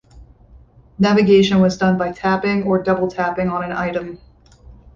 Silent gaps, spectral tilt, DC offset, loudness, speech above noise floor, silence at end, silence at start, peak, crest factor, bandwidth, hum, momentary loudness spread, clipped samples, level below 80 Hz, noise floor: none; -6.5 dB/octave; under 0.1%; -17 LUFS; 30 dB; 0.25 s; 0.15 s; -2 dBFS; 16 dB; 7.2 kHz; none; 10 LU; under 0.1%; -46 dBFS; -46 dBFS